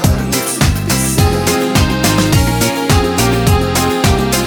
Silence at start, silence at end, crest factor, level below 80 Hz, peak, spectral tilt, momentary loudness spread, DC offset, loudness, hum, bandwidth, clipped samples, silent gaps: 0 s; 0 s; 12 dB; -22 dBFS; 0 dBFS; -4.5 dB/octave; 2 LU; under 0.1%; -13 LUFS; none; over 20 kHz; under 0.1%; none